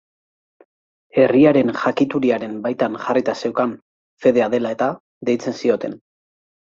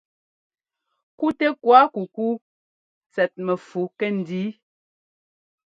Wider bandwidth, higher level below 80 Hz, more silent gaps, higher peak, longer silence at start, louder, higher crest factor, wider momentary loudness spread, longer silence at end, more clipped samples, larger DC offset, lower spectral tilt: about the same, 7.6 kHz vs 7.6 kHz; first, -62 dBFS vs -72 dBFS; about the same, 3.82-4.17 s, 5.00-5.21 s vs 2.41-3.01 s; about the same, -2 dBFS vs 0 dBFS; about the same, 1.15 s vs 1.2 s; first, -19 LUFS vs -22 LUFS; second, 18 dB vs 24 dB; second, 10 LU vs 14 LU; second, 0.75 s vs 1.2 s; neither; neither; about the same, -6.5 dB/octave vs -7.5 dB/octave